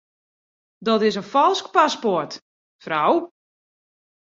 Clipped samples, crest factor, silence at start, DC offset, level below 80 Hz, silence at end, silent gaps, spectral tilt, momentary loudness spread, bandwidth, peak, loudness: under 0.1%; 20 dB; 0.8 s; under 0.1%; -72 dBFS; 1.05 s; 2.42-2.79 s; -4.5 dB/octave; 13 LU; 7.8 kHz; -2 dBFS; -20 LUFS